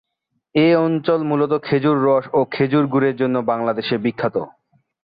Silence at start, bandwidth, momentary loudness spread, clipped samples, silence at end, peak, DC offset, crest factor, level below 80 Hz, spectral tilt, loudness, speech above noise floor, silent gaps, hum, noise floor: 0.55 s; 5 kHz; 7 LU; under 0.1%; 0.55 s; -4 dBFS; under 0.1%; 14 dB; -60 dBFS; -10.5 dB/octave; -18 LUFS; 56 dB; none; none; -74 dBFS